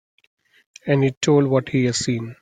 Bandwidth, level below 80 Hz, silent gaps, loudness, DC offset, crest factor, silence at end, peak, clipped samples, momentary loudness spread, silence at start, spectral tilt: 9.6 kHz; -58 dBFS; 1.17-1.21 s; -20 LUFS; under 0.1%; 16 dB; 0.1 s; -4 dBFS; under 0.1%; 7 LU; 0.85 s; -5.5 dB/octave